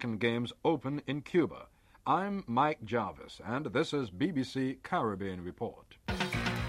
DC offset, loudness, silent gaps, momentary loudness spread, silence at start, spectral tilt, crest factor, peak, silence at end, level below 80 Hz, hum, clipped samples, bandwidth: under 0.1%; -34 LUFS; none; 10 LU; 0 s; -6 dB/octave; 18 dB; -16 dBFS; 0 s; -56 dBFS; none; under 0.1%; 16 kHz